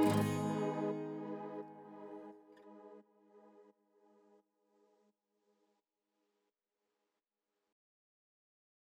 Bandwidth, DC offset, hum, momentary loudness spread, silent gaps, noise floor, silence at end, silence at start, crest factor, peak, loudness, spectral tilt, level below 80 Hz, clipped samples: 17.5 kHz; under 0.1%; none; 24 LU; none; under -90 dBFS; 5.3 s; 0 s; 22 dB; -20 dBFS; -39 LUFS; -6.5 dB/octave; under -90 dBFS; under 0.1%